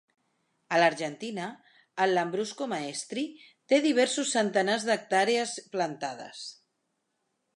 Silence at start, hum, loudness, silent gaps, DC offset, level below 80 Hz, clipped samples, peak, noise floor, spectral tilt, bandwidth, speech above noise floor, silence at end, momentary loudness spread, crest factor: 0.7 s; none; -28 LUFS; none; under 0.1%; -84 dBFS; under 0.1%; -8 dBFS; -79 dBFS; -3 dB/octave; 11.5 kHz; 51 dB; 1 s; 14 LU; 20 dB